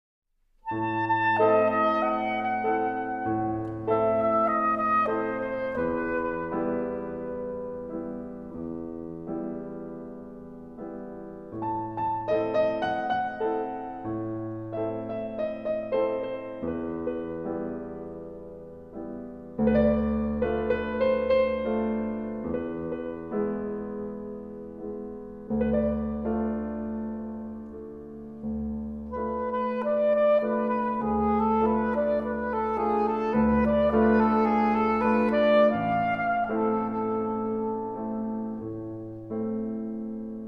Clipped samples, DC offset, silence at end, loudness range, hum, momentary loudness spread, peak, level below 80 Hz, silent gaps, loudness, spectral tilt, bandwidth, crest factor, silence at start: under 0.1%; 0.1%; 0 s; 10 LU; none; 16 LU; -10 dBFS; -48 dBFS; none; -27 LUFS; -9 dB/octave; 5.6 kHz; 18 dB; 0.65 s